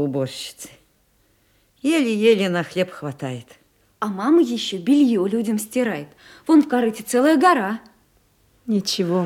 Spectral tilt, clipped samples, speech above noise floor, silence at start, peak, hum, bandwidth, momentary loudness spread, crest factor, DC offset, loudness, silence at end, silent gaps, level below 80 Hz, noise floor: -5 dB/octave; under 0.1%; 42 dB; 0 s; -2 dBFS; none; 16.5 kHz; 16 LU; 18 dB; under 0.1%; -20 LUFS; 0 s; none; -66 dBFS; -61 dBFS